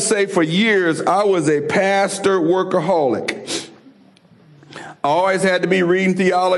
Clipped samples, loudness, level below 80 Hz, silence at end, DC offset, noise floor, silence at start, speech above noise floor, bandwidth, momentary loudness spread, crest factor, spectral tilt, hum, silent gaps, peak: under 0.1%; -17 LUFS; -64 dBFS; 0 s; under 0.1%; -49 dBFS; 0 s; 33 dB; 12 kHz; 9 LU; 12 dB; -4.5 dB/octave; none; none; -4 dBFS